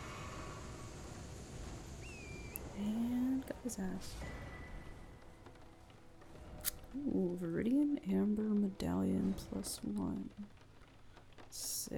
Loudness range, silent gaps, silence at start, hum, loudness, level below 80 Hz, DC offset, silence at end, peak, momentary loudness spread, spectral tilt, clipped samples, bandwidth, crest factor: 10 LU; none; 0 s; none; -40 LUFS; -56 dBFS; under 0.1%; 0 s; -16 dBFS; 22 LU; -5.5 dB/octave; under 0.1%; 19 kHz; 24 dB